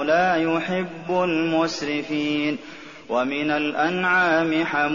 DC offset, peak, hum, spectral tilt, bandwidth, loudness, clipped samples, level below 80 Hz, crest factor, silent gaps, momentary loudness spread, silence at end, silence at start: 0.2%; -8 dBFS; none; -3 dB/octave; 7.2 kHz; -22 LUFS; under 0.1%; -62 dBFS; 14 dB; none; 8 LU; 0 s; 0 s